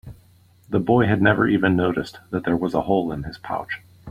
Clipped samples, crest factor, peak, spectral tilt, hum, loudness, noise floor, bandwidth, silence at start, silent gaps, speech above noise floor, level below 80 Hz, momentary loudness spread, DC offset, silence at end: under 0.1%; 20 dB; -2 dBFS; -8 dB/octave; none; -21 LUFS; -54 dBFS; 15 kHz; 0.05 s; none; 33 dB; -48 dBFS; 12 LU; under 0.1%; 0 s